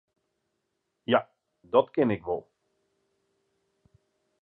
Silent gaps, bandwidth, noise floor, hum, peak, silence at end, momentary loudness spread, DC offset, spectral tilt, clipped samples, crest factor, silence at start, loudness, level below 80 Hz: none; 4.4 kHz; -80 dBFS; none; -8 dBFS; 2 s; 10 LU; under 0.1%; -9 dB/octave; under 0.1%; 24 dB; 1.1 s; -27 LUFS; -66 dBFS